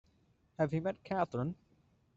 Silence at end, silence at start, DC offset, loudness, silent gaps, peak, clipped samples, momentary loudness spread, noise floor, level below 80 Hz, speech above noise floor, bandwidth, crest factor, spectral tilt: 0.65 s; 0.6 s; under 0.1%; -36 LUFS; none; -18 dBFS; under 0.1%; 15 LU; -71 dBFS; -70 dBFS; 36 dB; 7.6 kHz; 20 dB; -7.5 dB/octave